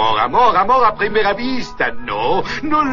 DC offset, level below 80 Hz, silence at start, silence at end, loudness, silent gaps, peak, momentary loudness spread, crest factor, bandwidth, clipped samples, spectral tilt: 5%; -38 dBFS; 0 s; 0 s; -16 LUFS; none; -2 dBFS; 8 LU; 14 dB; 7.4 kHz; under 0.1%; -5 dB/octave